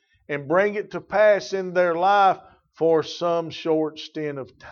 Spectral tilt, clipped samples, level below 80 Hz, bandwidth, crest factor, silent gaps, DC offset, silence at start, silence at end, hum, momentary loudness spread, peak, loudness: -5.5 dB/octave; under 0.1%; -66 dBFS; 7.2 kHz; 16 dB; none; under 0.1%; 0.3 s; 0 s; none; 13 LU; -6 dBFS; -22 LUFS